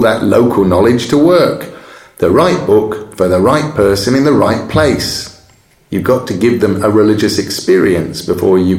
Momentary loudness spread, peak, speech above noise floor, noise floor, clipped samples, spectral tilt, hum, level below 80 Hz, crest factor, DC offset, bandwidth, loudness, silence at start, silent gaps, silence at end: 8 LU; 0 dBFS; 37 dB; -47 dBFS; under 0.1%; -6 dB/octave; none; -40 dBFS; 10 dB; under 0.1%; 16.5 kHz; -11 LUFS; 0 s; none; 0 s